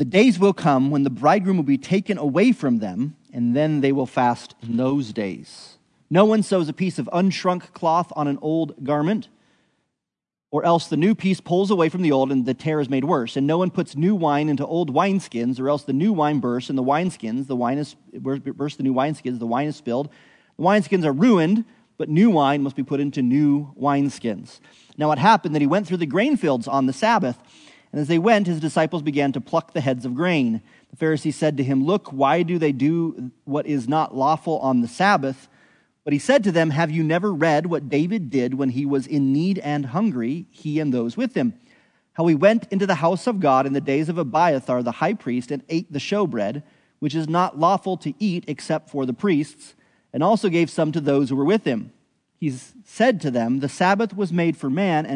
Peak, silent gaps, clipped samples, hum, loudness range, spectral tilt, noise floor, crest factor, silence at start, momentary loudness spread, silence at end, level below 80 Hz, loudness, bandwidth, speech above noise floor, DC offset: -2 dBFS; none; under 0.1%; none; 3 LU; -7 dB/octave; -88 dBFS; 20 dB; 0 s; 10 LU; 0 s; -72 dBFS; -21 LUFS; 10.5 kHz; 67 dB; under 0.1%